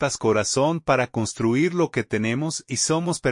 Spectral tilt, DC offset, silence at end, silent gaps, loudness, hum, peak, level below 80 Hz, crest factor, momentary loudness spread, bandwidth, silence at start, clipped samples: -4.5 dB/octave; under 0.1%; 0 s; none; -22 LUFS; none; -6 dBFS; -54 dBFS; 16 dB; 4 LU; 11 kHz; 0 s; under 0.1%